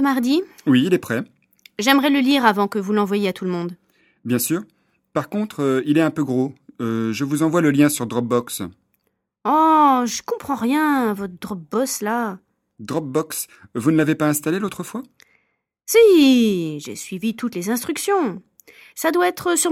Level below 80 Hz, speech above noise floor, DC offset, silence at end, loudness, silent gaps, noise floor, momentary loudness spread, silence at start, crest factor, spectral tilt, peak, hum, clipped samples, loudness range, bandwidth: -62 dBFS; 51 dB; under 0.1%; 0 s; -19 LUFS; none; -70 dBFS; 15 LU; 0 s; 20 dB; -4.5 dB/octave; 0 dBFS; none; under 0.1%; 5 LU; 16.5 kHz